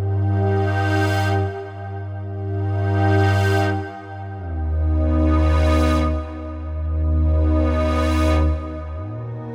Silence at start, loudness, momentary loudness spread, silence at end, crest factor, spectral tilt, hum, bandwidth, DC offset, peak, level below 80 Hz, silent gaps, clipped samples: 0 s; -21 LUFS; 13 LU; 0 s; 12 dB; -7.5 dB/octave; none; 10.5 kHz; under 0.1%; -6 dBFS; -24 dBFS; none; under 0.1%